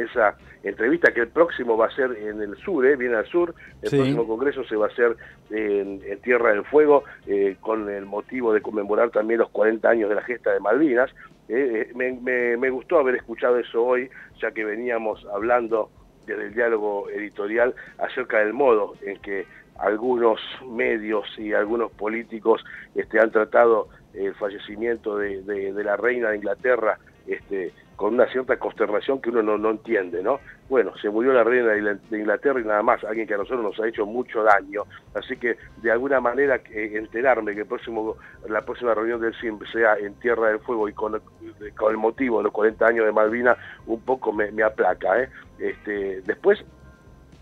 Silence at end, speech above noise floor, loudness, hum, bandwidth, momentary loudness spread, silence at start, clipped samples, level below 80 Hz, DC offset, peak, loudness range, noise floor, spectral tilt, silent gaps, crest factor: 0.5 s; 26 dB; -23 LUFS; none; 7.6 kHz; 11 LU; 0 s; under 0.1%; -56 dBFS; under 0.1%; -4 dBFS; 3 LU; -49 dBFS; -7 dB/octave; none; 20 dB